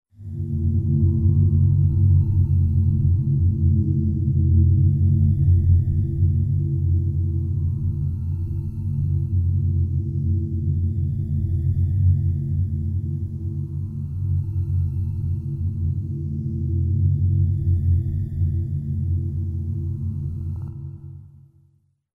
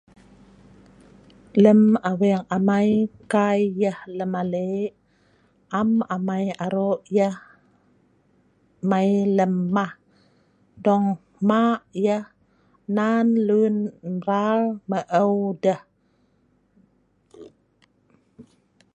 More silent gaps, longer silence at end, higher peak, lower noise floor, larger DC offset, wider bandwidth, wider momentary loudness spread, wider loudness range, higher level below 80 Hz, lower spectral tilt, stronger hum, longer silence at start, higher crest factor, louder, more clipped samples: neither; first, 0.9 s vs 0.55 s; second, -6 dBFS vs -2 dBFS; about the same, -61 dBFS vs -64 dBFS; neither; second, 0.9 kHz vs 9.6 kHz; about the same, 10 LU vs 9 LU; about the same, 7 LU vs 6 LU; first, -32 dBFS vs -66 dBFS; first, -13 dB/octave vs -8 dB/octave; neither; second, 0.2 s vs 1.55 s; second, 14 dB vs 20 dB; about the same, -22 LUFS vs -22 LUFS; neither